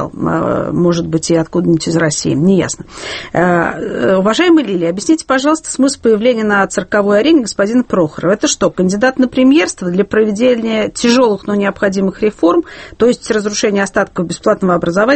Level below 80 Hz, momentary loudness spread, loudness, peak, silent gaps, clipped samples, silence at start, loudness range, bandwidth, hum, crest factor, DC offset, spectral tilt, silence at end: -44 dBFS; 6 LU; -13 LUFS; 0 dBFS; none; under 0.1%; 0 s; 2 LU; 8.8 kHz; none; 12 dB; under 0.1%; -5 dB/octave; 0 s